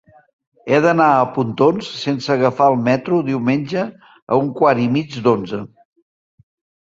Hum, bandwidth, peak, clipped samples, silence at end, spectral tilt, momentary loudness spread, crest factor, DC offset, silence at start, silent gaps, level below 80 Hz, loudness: none; 7.8 kHz; -2 dBFS; under 0.1%; 1.2 s; -7 dB/octave; 10 LU; 16 dB; under 0.1%; 0.65 s; 4.22-4.27 s; -58 dBFS; -17 LUFS